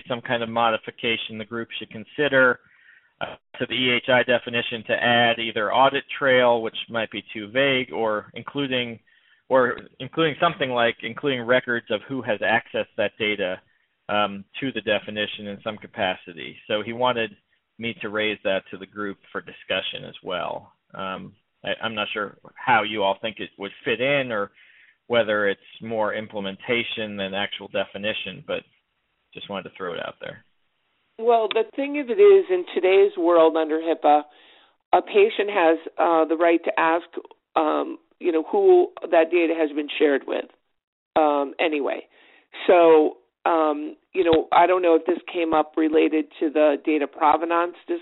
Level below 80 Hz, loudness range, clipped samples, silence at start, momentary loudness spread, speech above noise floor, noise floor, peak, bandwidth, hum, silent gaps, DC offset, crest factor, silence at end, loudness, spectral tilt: -64 dBFS; 9 LU; under 0.1%; 0.05 s; 15 LU; 50 dB; -73 dBFS; -6 dBFS; 4.1 kHz; none; 34.85-34.91 s, 40.84-41.11 s; under 0.1%; 18 dB; 0 s; -22 LUFS; -2 dB/octave